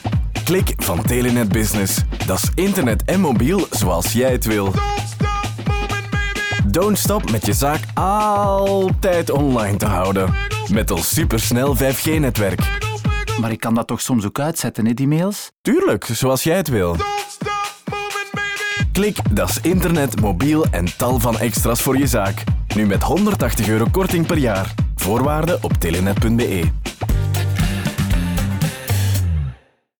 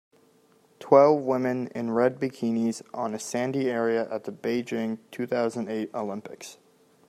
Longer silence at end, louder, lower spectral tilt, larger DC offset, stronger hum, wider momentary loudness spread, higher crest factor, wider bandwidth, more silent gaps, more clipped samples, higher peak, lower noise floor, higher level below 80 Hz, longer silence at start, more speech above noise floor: about the same, 0.45 s vs 0.55 s; first, -18 LUFS vs -26 LUFS; about the same, -5 dB/octave vs -6 dB/octave; first, 0.2% vs under 0.1%; neither; second, 5 LU vs 13 LU; second, 10 dB vs 22 dB; first, over 20 kHz vs 14.5 kHz; first, 15.58-15.64 s vs none; neither; second, -8 dBFS vs -4 dBFS; second, -40 dBFS vs -61 dBFS; first, -28 dBFS vs -76 dBFS; second, 0 s vs 0.8 s; second, 23 dB vs 35 dB